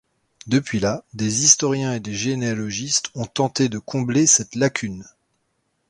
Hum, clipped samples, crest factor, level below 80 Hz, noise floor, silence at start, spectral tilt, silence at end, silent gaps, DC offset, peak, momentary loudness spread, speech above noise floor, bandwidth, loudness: none; under 0.1%; 22 dB; -54 dBFS; -71 dBFS; 0.45 s; -3.5 dB/octave; 0.85 s; none; under 0.1%; 0 dBFS; 11 LU; 50 dB; 11.5 kHz; -20 LUFS